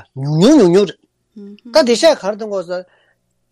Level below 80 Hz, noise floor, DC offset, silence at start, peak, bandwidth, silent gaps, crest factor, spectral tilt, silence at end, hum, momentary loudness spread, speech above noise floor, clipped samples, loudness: -54 dBFS; -61 dBFS; under 0.1%; 0.15 s; 0 dBFS; 14 kHz; none; 14 dB; -5.5 dB/octave; 0.7 s; none; 13 LU; 48 dB; under 0.1%; -13 LUFS